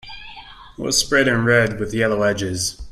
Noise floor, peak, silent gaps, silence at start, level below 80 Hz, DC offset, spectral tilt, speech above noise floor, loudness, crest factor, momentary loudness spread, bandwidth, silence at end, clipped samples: -40 dBFS; 0 dBFS; none; 0.05 s; -42 dBFS; under 0.1%; -3.5 dB/octave; 21 dB; -18 LUFS; 20 dB; 20 LU; 15.5 kHz; 0 s; under 0.1%